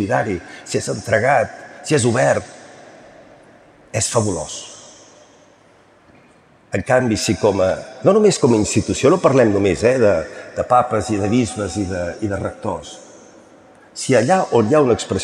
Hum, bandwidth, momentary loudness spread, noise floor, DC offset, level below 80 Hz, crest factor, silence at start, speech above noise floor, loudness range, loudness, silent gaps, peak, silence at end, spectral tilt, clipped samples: none; 13.5 kHz; 14 LU; -51 dBFS; under 0.1%; -50 dBFS; 18 dB; 0 s; 34 dB; 10 LU; -17 LUFS; none; -2 dBFS; 0 s; -5 dB/octave; under 0.1%